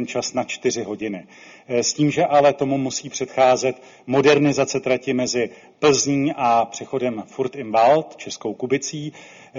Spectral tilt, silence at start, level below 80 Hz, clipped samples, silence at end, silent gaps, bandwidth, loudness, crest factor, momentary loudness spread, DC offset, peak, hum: -4 dB/octave; 0 s; -62 dBFS; under 0.1%; 0 s; none; 7.6 kHz; -20 LUFS; 18 dB; 12 LU; under 0.1%; -4 dBFS; none